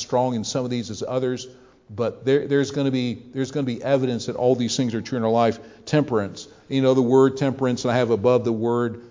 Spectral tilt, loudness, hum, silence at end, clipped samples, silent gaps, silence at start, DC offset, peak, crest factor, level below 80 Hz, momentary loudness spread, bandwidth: -6 dB/octave; -22 LUFS; none; 0 s; under 0.1%; none; 0 s; under 0.1%; -4 dBFS; 18 dB; -58 dBFS; 9 LU; 7.6 kHz